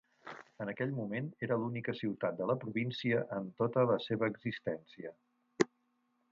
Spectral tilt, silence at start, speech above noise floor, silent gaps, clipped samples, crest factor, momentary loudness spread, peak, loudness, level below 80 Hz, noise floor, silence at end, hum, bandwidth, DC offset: -5.5 dB/octave; 0.25 s; 42 dB; none; under 0.1%; 26 dB; 15 LU; -12 dBFS; -36 LUFS; -76 dBFS; -78 dBFS; 0.65 s; none; 7.4 kHz; under 0.1%